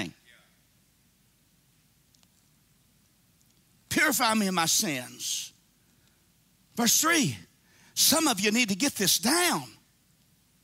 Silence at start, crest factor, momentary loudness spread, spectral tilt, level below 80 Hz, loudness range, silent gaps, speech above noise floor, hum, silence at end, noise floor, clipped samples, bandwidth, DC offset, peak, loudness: 0 s; 20 dB; 14 LU; -2 dB/octave; -68 dBFS; 6 LU; none; 40 dB; none; 0.95 s; -66 dBFS; under 0.1%; 16 kHz; under 0.1%; -10 dBFS; -24 LUFS